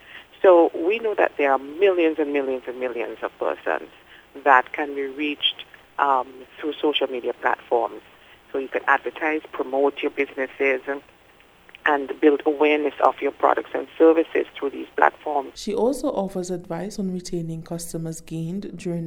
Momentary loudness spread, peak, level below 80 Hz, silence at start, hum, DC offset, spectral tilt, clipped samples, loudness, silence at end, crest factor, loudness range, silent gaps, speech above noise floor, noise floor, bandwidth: 13 LU; 0 dBFS; -58 dBFS; 0.1 s; none; under 0.1%; -5 dB/octave; under 0.1%; -23 LUFS; 0 s; 22 dB; 5 LU; none; 31 dB; -53 dBFS; over 20 kHz